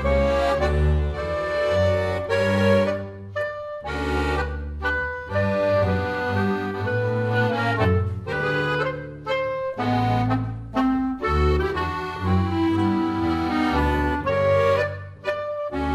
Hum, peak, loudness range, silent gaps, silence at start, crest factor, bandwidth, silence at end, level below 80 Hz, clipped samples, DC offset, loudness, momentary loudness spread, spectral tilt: none; -6 dBFS; 2 LU; none; 0 s; 16 dB; 12.5 kHz; 0 s; -32 dBFS; under 0.1%; under 0.1%; -23 LUFS; 8 LU; -7.5 dB/octave